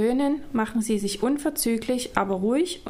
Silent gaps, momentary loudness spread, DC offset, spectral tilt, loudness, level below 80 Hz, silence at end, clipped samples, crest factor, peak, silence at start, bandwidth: none; 2 LU; under 0.1%; -4.5 dB/octave; -25 LUFS; -50 dBFS; 0 s; under 0.1%; 20 dB; -4 dBFS; 0 s; 16 kHz